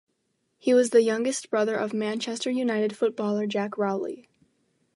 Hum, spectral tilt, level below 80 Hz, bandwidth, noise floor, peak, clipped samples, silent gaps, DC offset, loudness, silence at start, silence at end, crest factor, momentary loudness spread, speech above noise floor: none; -4.5 dB/octave; -80 dBFS; 11.5 kHz; -75 dBFS; -8 dBFS; under 0.1%; none; under 0.1%; -26 LUFS; 0.65 s; 0.75 s; 18 dB; 8 LU; 50 dB